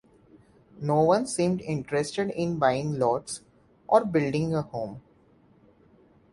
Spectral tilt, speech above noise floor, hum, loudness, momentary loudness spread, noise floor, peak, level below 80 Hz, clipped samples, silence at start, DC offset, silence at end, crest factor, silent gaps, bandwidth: -6 dB/octave; 34 dB; none; -26 LUFS; 13 LU; -60 dBFS; -6 dBFS; -60 dBFS; under 0.1%; 0.75 s; under 0.1%; 1.35 s; 22 dB; none; 11.5 kHz